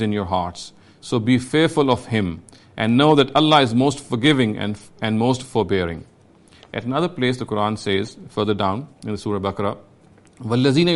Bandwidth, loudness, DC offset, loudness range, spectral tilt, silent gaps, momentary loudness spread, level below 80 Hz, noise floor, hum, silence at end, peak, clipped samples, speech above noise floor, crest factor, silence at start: 11.5 kHz; -20 LUFS; under 0.1%; 6 LU; -6 dB/octave; none; 15 LU; -52 dBFS; -51 dBFS; none; 0 s; -2 dBFS; under 0.1%; 31 dB; 18 dB; 0 s